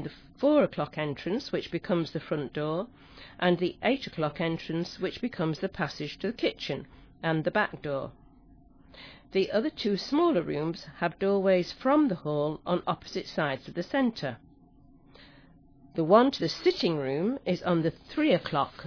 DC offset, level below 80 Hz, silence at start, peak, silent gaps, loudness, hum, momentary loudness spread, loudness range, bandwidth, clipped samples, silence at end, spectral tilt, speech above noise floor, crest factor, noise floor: under 0.1%; -60 dBFS; 0 s; -6 dBFS; none; -29 LUFS; none; 10 LU; 5 LU; 5.4 kHz; under 0.1%; 0 s; -6.5 dB/octave; 28 dB; 22 dB; -57 dBFS